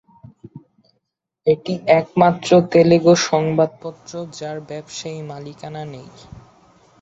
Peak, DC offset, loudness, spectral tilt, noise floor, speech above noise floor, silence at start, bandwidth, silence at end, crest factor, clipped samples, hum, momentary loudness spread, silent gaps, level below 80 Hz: 0 dBFS; under 0.1%; -16 LUFS; -5.5 dB/octave; -74 dBFS; 56 dB; 0.55 s; 8 kHz; 0.6 s; 18 dB; under 0.1%; none; 20 LU; none; -56 dBFS